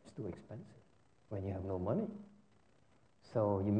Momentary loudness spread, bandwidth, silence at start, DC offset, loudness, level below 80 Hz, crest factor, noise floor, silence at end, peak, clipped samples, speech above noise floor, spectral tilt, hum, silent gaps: 18 LU; 9 kHz; 0.05 s; under 0.1%; -40 LUFS; -70 dBFS; 18 dB; -71 dBFS; 0 s; -22 dBFS; under 0.1%; 34 dB; -10 dB/octave; none; none